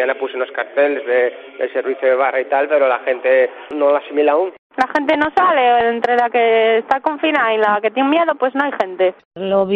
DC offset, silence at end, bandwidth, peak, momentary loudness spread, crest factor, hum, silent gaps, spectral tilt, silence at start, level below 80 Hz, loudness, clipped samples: under 0.1%; 0 s; 6.8 kHz; -2 dBFS; 7 LU; 14 dB; none; 4.59-4.70 s, 9.25-9.31 s; -6 dB/octave; 0 s; -60 dBFS; -16 LUFS; under 0.1%